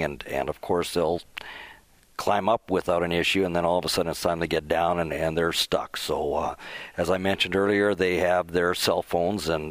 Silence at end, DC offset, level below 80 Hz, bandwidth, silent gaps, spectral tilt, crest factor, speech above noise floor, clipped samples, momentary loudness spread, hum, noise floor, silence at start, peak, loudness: 0 s; under 0.1%; -50 dBFS; 16 kHz; none; -4.5 dB/octave; 18 dB; 27 dB; under 0.1%; 8 LU; none; -53 dBFS; 0 s; -8 dBFS; -25 LUFS